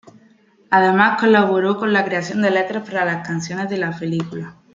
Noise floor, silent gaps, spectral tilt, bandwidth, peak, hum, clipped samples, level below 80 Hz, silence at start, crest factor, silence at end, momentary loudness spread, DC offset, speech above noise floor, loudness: -53 dBFS; none; -6 dB/octave; 7.6 kHz; -2 dBFS; none; under 0.1%; -64 dBFS; 0.7 s; 16 dB; 0.2 s; 10 LU; under 0.1%; 35 dB; -18 LUFS